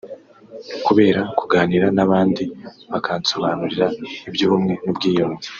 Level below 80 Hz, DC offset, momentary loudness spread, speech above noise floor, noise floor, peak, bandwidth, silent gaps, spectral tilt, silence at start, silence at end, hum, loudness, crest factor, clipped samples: -56 dBFS; under 0.1%; 13 LU; 21 dB; -40 dBFS; -2 dBFS; 7.2 kHz; none; -4.5 dB/octave; 0.05 s; 0 s; none; -19 LUFS; 18 dB; under 0.1%